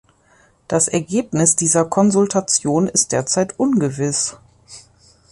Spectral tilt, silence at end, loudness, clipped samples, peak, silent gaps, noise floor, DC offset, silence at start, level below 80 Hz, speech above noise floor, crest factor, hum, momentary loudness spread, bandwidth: -4 dB/octave; 0.5 s; -17 LUFS; under 0.1%; -2 dBFS; none; -55 dBFS; under 0.1%; 0.7 s; -54 dBFS; 37 dB; 16 dB; none; 6 LU; 11.5 kHz